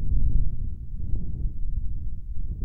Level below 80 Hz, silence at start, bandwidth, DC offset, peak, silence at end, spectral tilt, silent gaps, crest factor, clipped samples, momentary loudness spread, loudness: -26 dBFS; 0 s; 0.7 kHz; under 0.1%; -10 dBFS; 0 s; -13 dB/octave; none; 12 dB; under 0.1%; 9 LU; -33 LUFS